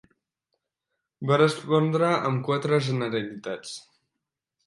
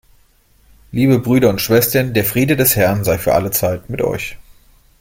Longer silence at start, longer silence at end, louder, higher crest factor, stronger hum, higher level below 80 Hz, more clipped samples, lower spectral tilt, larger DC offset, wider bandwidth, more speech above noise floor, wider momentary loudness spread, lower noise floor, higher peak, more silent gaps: first, 1.2 s vs 0.95 s; first, 0.85 s vs 0.6 s; second, -25 LUFS vs -15 LUFS; about the same, 20 dB vs 16 dB; neither; second, -72 dBFS vs -42 dBFS; neither; first, -6.5 dB/octave vs -5 dB/octave; neither; second, 11.5 kHz vs 16.5 kHz; first, 60 dB vs 38 dB; first, 14 LU vs 8 LU; first, -85 dBFS vs -53 dBFS; second, -8 dBFS vs 0 dBFS; neither